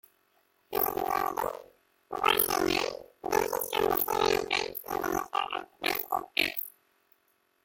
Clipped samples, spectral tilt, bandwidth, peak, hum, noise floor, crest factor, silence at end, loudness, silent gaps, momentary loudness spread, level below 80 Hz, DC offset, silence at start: under 0.1%; -2.5 dB/octave; 17 kHz; -6 dBFS; none; -72 dBFS; 24 dB; 0.95 s; -29 LUFS; none; 10 LU; -58 dBFS; under 0.1%; 0.7 s